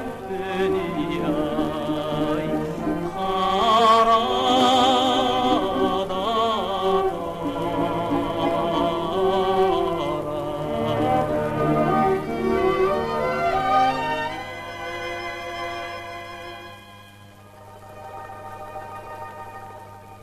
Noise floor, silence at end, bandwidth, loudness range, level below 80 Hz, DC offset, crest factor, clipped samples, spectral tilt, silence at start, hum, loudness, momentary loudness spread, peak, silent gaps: -46 dBFS; 0 s; 14.5 kHz; 17 LU; -46 dBFS; under 0.1%; 14 dB; under 0.1%; -5.5 dB/octave; 0 s; none; -22 LUFS; 18 LU; -8 dBFS; none